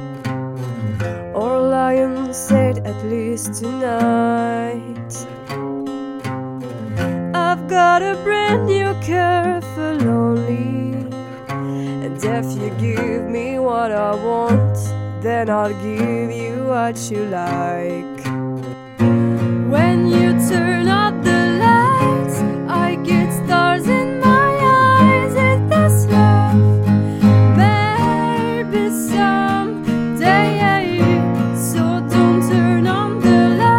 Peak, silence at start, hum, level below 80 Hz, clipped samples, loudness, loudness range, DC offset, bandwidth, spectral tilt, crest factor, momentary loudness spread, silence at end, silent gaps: -2 dBFS; 0 s; none; -48 dBFS; under 0.1%; -16 LUFS; 8 LU; under 0.1%; 16.5 kHz; -6.5 dB/octave; 14 dB; 12 LU; 0 s; none